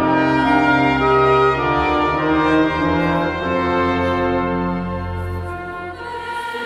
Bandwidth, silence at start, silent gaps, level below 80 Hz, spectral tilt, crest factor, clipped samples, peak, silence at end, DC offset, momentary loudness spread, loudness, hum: 12 kHz; 0 s; none; -36 dBFS; -7 dB/octave; 14 dB; under 0.1%; -4 dBFS; 0 s; under 0.1%; 12 LU; -17 LUFS; none